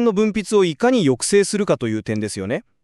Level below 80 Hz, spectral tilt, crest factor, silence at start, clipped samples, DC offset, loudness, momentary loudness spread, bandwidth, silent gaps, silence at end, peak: -54 dBFS; -5 dB/octave; 14 dB; 0 s; under 0.1%; under 0.1%; -19 LUFS; 8 LU; 12.5 kHz; none; 0.25 s; -6 dBFS